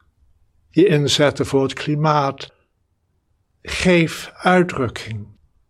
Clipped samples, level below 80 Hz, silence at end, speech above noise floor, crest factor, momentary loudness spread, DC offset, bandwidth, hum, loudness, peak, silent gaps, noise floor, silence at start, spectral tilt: under 0.1%; -48 dBFS; 0.45 s; 49 dB; 18 dB; 17 LU; under 0.1%; 14.5 kHz; none; -18 LUFS; 0 dBFS; none; -67 dBFS; 0.75 s; -5.5 dB/octave